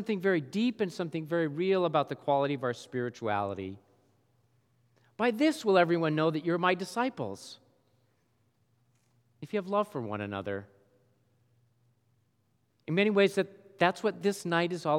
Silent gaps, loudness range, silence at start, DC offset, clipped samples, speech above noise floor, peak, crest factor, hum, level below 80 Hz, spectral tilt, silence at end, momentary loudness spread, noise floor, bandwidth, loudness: none; 8 LU; 0 s; under 0.1%; under 0.1%; 44 dB; -10 dBFS; 22 dB; none; -86 dBFS; -6 dB/octave; 0 s; 12 LU; -73 dBFS; 14.5 kHz; -30 LUFS